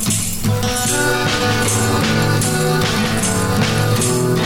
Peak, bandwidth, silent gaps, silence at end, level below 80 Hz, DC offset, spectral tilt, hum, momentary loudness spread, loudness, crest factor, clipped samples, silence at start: -4 dBFS; 19 kHz; none; 0 s; -34 dBFS; under 0.1%; -4 dB/octave; none; 2 LU; -16 LUFS; 12 dB; under 0.1%; 0 s